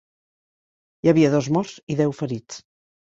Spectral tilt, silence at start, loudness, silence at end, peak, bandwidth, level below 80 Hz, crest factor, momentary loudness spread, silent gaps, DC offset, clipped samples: -7 dB/octave; 1.05 s; -21 LUFS; 0.5 s; -4 dBFS; 8 kHz; -60 dBFS; 20 dB; 16 LU; 1.83-1.87 s; under 0.1%; under 0.1%